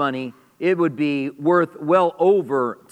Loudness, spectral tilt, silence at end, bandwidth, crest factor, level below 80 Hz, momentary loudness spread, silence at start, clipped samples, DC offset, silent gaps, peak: -20 LUFS; -7.5 dB/octave; 0.2 s; 9 kHz; 16 dB; -76 dBFS; 7 LU; 0 s; under 0.1%; under 0.1%; none; -4 dBFS